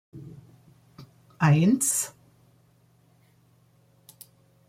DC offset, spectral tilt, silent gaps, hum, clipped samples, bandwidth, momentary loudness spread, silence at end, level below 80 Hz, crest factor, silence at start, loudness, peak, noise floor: under 0.1%; -5 dB/octave; none; none; under 0.1%; 16.5 kHz; 25 LU; 2.6 s; -66 dBFS; 20 dB; 0.15 s; -23 LUFS; -10 dBFS; -62 dBFS